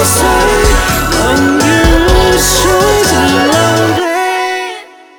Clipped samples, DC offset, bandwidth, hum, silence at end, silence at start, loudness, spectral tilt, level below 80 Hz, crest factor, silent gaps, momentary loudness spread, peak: under 0.1%; under 0.1%; over 20 kHz; none; 0.35 s; 0 s; -9 LUFS; -3.5 dB/octave; -18 dBFS; 10 dB; none; 5 LU; 0 dBFS